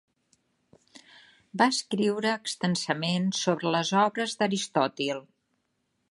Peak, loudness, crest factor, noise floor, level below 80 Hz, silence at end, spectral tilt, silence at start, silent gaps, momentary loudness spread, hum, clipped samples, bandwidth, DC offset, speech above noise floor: -8 dBFS; -27 LUFS; 20 dB; -76 dBFS; -74 dBFS; 0.9 s; -4 dB/octave; 0.95 s; none; 5 LU; none; under 0.1%; 11.5 kHz; under 0.1%; 49 dB